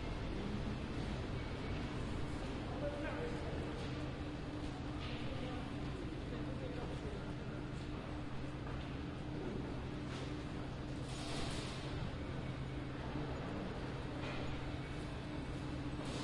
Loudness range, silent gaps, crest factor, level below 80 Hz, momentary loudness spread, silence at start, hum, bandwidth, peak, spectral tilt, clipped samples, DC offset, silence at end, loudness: 2 LU; none; 14 dB; -50 dBFS; 3 LU; 0 s; none; 11.5 kHz; -28 dBFS; -6.5 dB/octave; under 0.1%; under 0.1%; 0 s; -44 LUFS